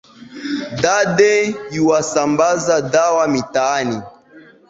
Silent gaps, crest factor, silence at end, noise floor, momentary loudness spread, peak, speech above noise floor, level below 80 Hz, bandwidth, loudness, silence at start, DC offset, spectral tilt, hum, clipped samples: none; 16 dB; 0.3 s; -45 dBFS; 11 LU; -2 dBFS; 29 dB; -54 dBFS; 8 kHz; -16 LUFS; 0.2 s; under 0.1%; -4 dB/octave; none; under 0.1%